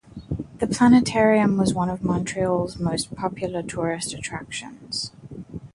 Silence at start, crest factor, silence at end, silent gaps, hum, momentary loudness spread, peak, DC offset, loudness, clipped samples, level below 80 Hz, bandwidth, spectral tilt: 0.15 s; 18 dB; 0.05 s; none; none; 17 LU; -6 dBFS; under 0.1%; -23 LUFS; under 0.1%; -48 dBFS; 11.5 kHz; -5.5 dB/octave